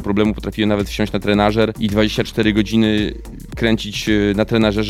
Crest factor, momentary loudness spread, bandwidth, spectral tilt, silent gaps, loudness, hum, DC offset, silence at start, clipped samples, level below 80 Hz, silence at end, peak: 16 dB; 5 LU; 15 kHz; -6 dB/octave; none; -17 LUFS; none; under 0.1%; 0 s; under 0.1%; -32 dBFS; 0 s; 0 dBFS